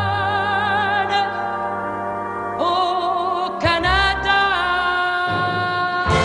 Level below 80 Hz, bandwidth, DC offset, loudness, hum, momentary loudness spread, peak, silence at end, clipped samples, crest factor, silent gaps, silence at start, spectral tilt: -38 dBFS; 11 kHz; under 0.1%; -19 LUFS; none; 8 LU; -2 dBFS; 0 s; under 0.1%; 16 dB; none; 0 s; -4.5 dB/octave